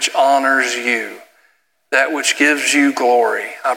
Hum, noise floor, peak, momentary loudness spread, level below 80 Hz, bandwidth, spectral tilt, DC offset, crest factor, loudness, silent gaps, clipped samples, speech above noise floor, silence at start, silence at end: none; -60 dBFS; 0 dBFS; 6 LU; -82 dBFS; 17.5 kHz; -0.5 dB/octave; under 0.1%; 16 dB; -15 LUFS; none; under 0.1%; 44 dB; 0 s; 0 s